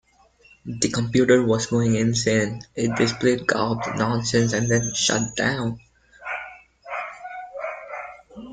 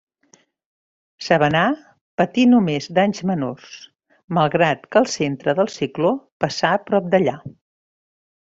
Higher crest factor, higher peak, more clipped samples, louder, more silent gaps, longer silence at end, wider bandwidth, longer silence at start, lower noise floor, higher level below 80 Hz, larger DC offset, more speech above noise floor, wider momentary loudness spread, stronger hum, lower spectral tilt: about the same, 20 dB vs 18 dB; about the same, -4 dBFS vs -2 dBFS; neither; second, -22 LUFS vs -19 LUFS; second, none vs 2.01-2.18 s, 4.24-4.28 s, 6.32-6.40 s; second, 0 s vs 0.95 s; first, 9.6 kHz vs 7.8 kHz; second, 0.65 s vs 1.2 s; about the same, -56 dBFS vs -57 dBFS; first, -52 dBFS vs -60 dBFS; neither; second, 34 dB vs 39 dB; about the same, 16 LU vs 14 LU; neither; about the same, -4.5 dB/octave vs -5.5 dB/octave